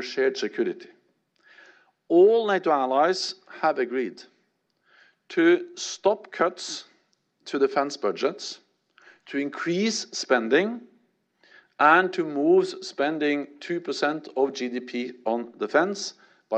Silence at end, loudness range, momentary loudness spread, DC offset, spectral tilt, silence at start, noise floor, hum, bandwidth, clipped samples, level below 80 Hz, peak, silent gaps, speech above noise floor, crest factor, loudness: 0 s; 5 LU; 14 LU; under 0.1%; -4 dB/octave; 0 s; -71 dBFS; none; 8.8 kHz; under 0.1%; -78 dBFS; -4 dBFS; none; 47 dB; 20 dB; -25 LUFS